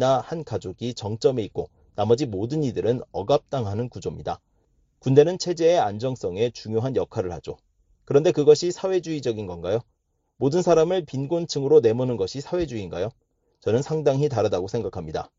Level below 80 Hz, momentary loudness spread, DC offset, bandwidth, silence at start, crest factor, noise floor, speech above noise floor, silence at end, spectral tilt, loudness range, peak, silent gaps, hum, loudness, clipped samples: -54 dBFS; 13 LU; under 0.1%; 7.8 kHz; 0 s; 20 dB; -65 dBFS; 42 dB; 0.15 s; -6.5 dB/octave; 3 LU; -4 dBFS; none; none; -24 LUFS; under 0.1%